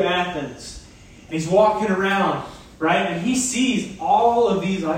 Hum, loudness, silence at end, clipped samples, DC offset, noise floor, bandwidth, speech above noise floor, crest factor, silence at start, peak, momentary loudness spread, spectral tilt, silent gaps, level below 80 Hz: none; -20 LUFS; 0 s; under 0.1%; under 0.1%; -44 dBFS; 16 kHz; 25 dB; 16 dB; 0 s; -4 dBFS; 15 LU; -4.5 dB/octave; none; -50 dBFS